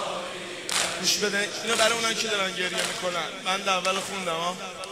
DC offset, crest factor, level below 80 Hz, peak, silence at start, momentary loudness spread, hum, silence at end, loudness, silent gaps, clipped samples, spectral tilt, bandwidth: under 0.1%; 22 dB; -66 dBFS; -6 dBFS; 0 s; 9 LU; none; 0 s; -25 LUFS; none; under 0.1%; -1 dB/octave; 16 kHz